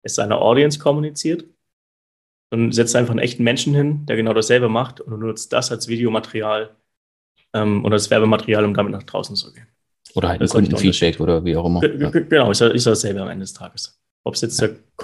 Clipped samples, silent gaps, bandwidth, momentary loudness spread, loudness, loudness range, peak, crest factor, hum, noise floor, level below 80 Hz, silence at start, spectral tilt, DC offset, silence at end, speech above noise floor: under 0.1%; 1.73-2.50 s, 6.97-7.35 s, 14.11-14.24 s; 12.5 kHz; 12 LU; -18 LUFS; 3 LU; 0 dBFS; 18 dB; none; under -90 dBFS; -46 dBFS; 0.05 s; -5 dB/octave; under 0.1%; 0 s; over 72 dB